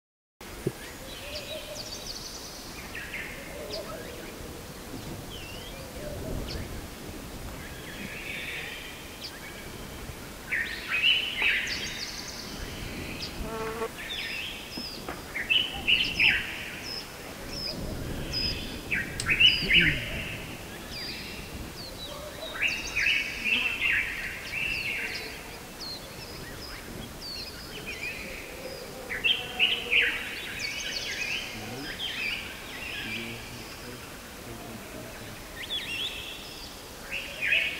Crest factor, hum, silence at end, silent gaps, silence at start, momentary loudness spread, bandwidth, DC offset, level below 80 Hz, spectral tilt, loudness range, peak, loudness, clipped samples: 24 dB; none; 0 s; none; 0.4 s; 17 LU; 16 kHz; under 0.1%; -48 dBFS; -2.5 dB/octave; 13 LU; -8 dBFS; -29 LUFS; under 0.1%